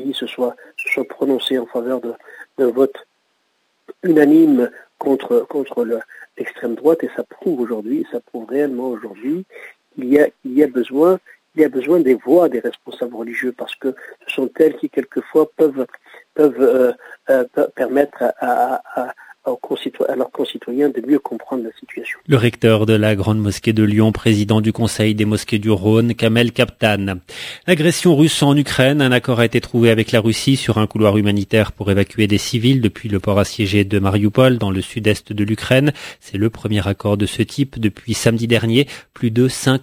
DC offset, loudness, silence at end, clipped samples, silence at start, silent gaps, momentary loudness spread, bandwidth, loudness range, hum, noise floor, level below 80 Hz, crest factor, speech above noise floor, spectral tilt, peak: under 0.1%; -17 LUFS; 0 s; under 0.1%; 0 s; none; 12 LU; 16 kHz; 6 LU; none; -65 dBFS; -42 dBFS; 16 dB; 49 dB; -6 dB/octave; 0 dBFS